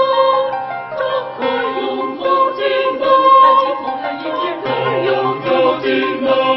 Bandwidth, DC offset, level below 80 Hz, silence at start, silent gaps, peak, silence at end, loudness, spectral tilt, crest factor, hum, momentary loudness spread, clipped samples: 5.8 kHz; under 0.1%; -62 dBFS; 0 s; none; 0 dBFS; 0 s; -15 LUFS; -7.5 dB/octave; 14 dB; none; 11 LU; under 0.1%